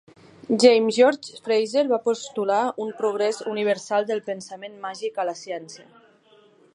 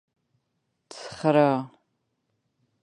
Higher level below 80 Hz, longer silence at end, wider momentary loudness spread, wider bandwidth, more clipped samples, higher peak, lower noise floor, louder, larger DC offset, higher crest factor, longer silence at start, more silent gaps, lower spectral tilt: second, -78 dBFS vs -72 dBFS; second, 0.95 s vs 1.15 s; second, 17 LU vs 21 LU; about the same, 11 kHz vs 10.5 kHz; neither; about the same, -4 dBFS vs -6 dBFS; second, -56 dBFS vs -77 dBFS; about the same, -23 LUFS vs -23 LUFS; neither; about the same, 20 dB vs 22 dB; second, 0.5 s vs 0.95 s; neither; second, -4 dB/octave vs -7 dB/octave